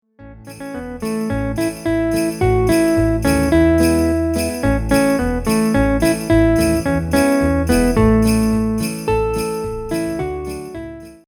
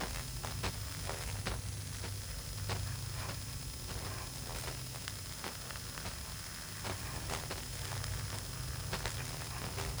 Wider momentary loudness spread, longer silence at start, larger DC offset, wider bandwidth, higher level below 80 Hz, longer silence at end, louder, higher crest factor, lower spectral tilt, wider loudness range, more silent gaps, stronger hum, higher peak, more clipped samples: first, 13 LU vs 3 LU; first, 0.2 s vs 0 s; neither; about the same, over 20 kHz vs over 20 kHz; first, -28 dBFS vs -48 dBFS; first, 0.15 s vs 0 s; first, -17 LUFS vs -41 LUFS; second, 16 dB vs 26 dB; first, -6 dB/octave vs -3 dB/octave; about the same, 3 LU vs 2 LU; neither; neither; first, -2 dBFS vs -16 dBFS; neither